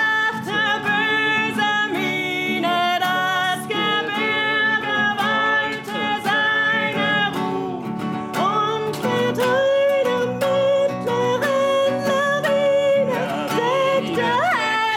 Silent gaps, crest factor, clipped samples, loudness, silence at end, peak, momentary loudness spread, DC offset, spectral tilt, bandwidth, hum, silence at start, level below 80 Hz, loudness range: none; 12 dB; under 0.1%; -19 LUFS; 0 s; -8 dBFS; 5 LU; under 0.1%; -4 dB/octave; 17.5 kHz; none; 0 s; -62 dBFS; 2 LU